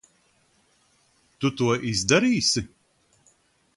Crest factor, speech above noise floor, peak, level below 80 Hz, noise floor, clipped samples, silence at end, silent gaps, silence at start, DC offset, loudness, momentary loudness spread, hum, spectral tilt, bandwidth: 24 dB; 42 dB; -2 dBFS; -54 dBFS; -65 dBFS; under 0.1%; 1.1 s; none; 1.4 s; under 0.1%; -23 LUFS; 9 LU; none; -3.5 dB/octave; 11.5 kHz